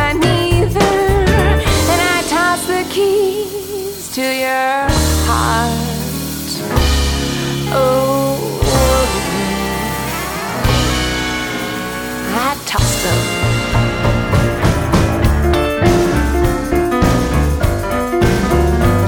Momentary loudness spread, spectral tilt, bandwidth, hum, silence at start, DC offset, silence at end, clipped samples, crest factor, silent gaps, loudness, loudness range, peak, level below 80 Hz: 7 LU; -5 dB/octave; 19 kHz; none; 0 s; under 0.1%; 0 s; under 0.1%; 14 dB; none; -15 LUFS; 3 LU; 0 dBFS; -22 dBFS